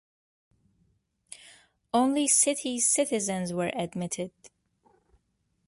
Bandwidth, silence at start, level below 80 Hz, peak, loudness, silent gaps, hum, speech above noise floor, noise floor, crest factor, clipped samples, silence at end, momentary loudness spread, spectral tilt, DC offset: 12 kHz; 1.3 s; -70 dBFS; -10 dBFS; -26 LUFS; none; none; 48 dB; -75 dBFS; 20 dB; under 0.1%; 1.2 s; 19 LU; -3 dB/octave; under 0.1%